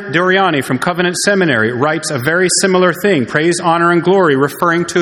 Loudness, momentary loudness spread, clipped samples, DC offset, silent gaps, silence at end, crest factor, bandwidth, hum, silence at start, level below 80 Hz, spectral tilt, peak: -12 LUFS; 4 LU; under 0.1%; under 0.1%; none; 0 s; 12 dB; 18.5 kHz; none; 0 s; -54 dBFS; -4 dB/octave; 0 dBFS